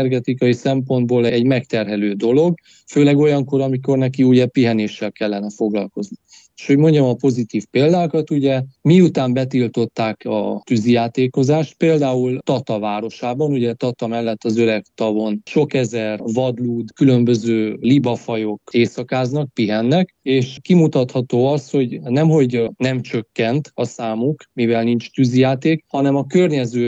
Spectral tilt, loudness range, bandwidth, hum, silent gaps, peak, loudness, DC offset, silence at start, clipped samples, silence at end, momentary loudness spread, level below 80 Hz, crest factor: -7.5 dB/octave; 3 LU; 8 kHz; none; none; -2 dBFS; -17 LUFS; under 0.1%; 0 s; under 0.1%; 0 s; 8 LU; -64 dBFS; 14 dB